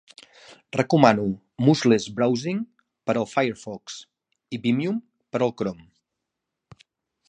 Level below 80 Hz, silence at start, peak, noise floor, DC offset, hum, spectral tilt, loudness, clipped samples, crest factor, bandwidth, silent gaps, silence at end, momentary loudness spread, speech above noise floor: -64 dBFS; 0.5 s; 0 dBFS; -83 dBFS; under 0.1%; none; -6 dB/octave; -23 LUFS; under 0.1%; 24 dB; 9.8 kHz; none; 1.55 s; 18 LU; 61 dB